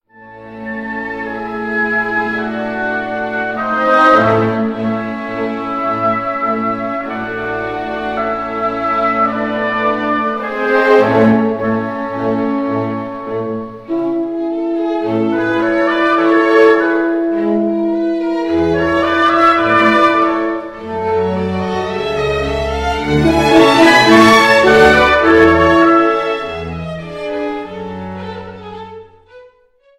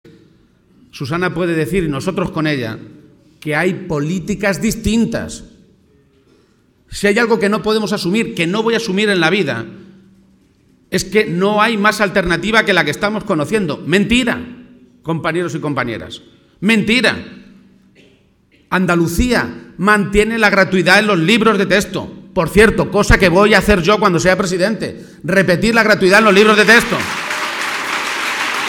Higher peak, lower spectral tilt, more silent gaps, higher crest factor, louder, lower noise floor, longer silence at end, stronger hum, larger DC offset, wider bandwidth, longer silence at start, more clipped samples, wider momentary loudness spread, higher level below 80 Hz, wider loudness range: about the same, 0 dBFS vs 0 dBFS; about the same, -5.5 dB/octave vs -4.5 dB/octave; neither; about the same, 14 dB vs 16 dB; about the same, -13 LUFS vs -14 LUFS; about the same, -51 dBFS vs -54 dBFS; first, 0.55 s vs 0 s; neither; neither; second, 13.5 kHz vs 18 kHz; second, 0.2 s vs 0.95 s; neither; about the same, 14 LU vs 13 LU; about the same, -38 dBFS vs -34 dBFS; about the same, 9 LU vs 7 LU